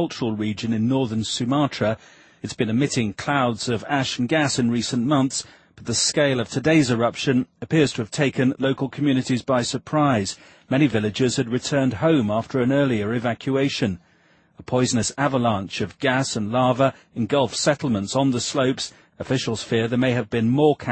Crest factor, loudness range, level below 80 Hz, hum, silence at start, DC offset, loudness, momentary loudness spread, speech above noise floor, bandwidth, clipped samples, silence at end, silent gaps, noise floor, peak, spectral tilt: 18 dB; 2 LU; -56 dBFS; none; 0 s; under 0.1%; -22 LUFS; 6 LU; 37 dB; 8.8 kHz; under 0.1%; 0 s; none; -58 dBFS; -4 dBFS; -5 dB/octave